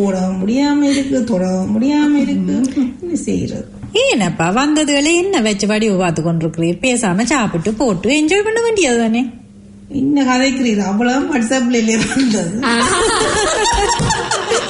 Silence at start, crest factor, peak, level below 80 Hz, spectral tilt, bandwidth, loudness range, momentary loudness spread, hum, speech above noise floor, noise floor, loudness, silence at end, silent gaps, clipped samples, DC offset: 0 s; 12 dB; -2 dBFS; -38 dBFS; -4 dB/octave; 11 kHz; 1 LU; 5 LU; none; 24 dB; -38 dBFS; -15 LUFS; 0 s; none; under 0.1%; under 0.1%